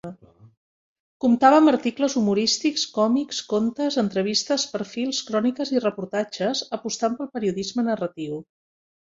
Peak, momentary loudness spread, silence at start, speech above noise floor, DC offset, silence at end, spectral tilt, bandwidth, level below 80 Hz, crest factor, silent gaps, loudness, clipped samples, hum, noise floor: -2 dBFS; 10 LU; 0.05 s; 20 dB; under 0.1%; 0.75 s; -4 dB/octave; 7.8 kHz; -66 dBFS; 20 dB; 0.57-1.20 s; -23 LUFS; under 0.1%; none; -43 dBFS